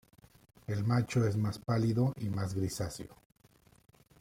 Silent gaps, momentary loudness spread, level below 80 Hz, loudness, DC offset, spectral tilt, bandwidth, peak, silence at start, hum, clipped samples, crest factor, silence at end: none; 12 LU; -60 dBFS; -33 LUFS; under 0.1%; -7 dB/octave; 15.5 kHz; -16 dBFS; 0.7 s; none; under 0.1%; 18 dB; 1.05 s